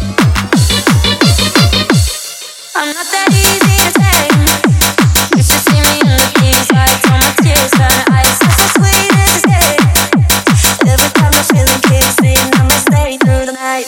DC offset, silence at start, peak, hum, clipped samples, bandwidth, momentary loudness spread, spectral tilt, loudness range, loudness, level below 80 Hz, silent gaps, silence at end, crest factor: under 0.1%; 0 s; 0 dBFS; none; 0.3%; over 20 kHz; 4 LU; -4 dB/octave; 2 LU; -8 LUFS; -20 dBFS; none; 0 s; 8 dB